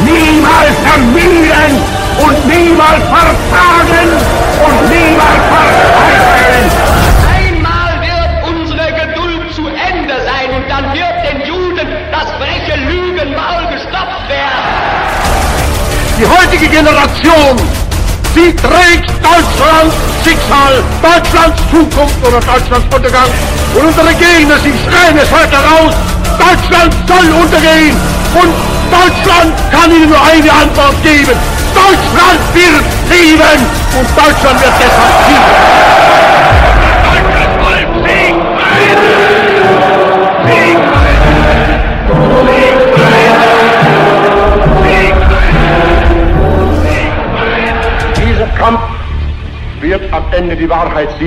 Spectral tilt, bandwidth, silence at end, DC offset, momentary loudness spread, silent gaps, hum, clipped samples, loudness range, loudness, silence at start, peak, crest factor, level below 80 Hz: -5 dB/octave; 16.5 kHz; 0 s; under 0.1%; 9 LU; none; none; 0.6%; 8 LU; -7 LUFS; 0 s; 0 dBFS; 6 dB; -16 dBFS